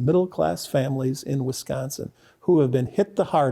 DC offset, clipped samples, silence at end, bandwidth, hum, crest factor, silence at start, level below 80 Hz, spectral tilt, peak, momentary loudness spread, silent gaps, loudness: under 0.1%; under 0.1%; 0 s; 15.5 kHz; none; 14 dB; 0 s; -58 dBFS; -6.5 dB/octave; -10 dBFS; 10 LU; none; -24 LUFS